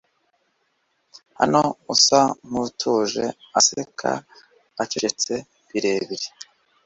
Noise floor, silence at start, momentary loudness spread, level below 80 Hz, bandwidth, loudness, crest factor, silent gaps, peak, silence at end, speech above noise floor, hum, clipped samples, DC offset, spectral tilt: -70 dBFS; 1.4 s; 14 LU; -64 dBFS; 8.2 kHz; -21 LUFS; 22 dB; none; -2 dBFS; 0.45 s; 48 dB; none; under 0.1%; under 0.1%; -2.5 dB/octave